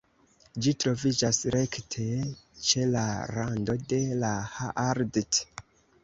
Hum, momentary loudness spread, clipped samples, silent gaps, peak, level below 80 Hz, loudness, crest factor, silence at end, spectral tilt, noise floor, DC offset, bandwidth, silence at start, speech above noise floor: none; 8 LU; under 0.1%; none; -10 dBFS; -56 dBFS; -28 LUFS; 20 dB; 0.45 s; -4 dB/octave; -62 dBFS; under 0.1%; 8 kHz; 0.55 s; 34 dB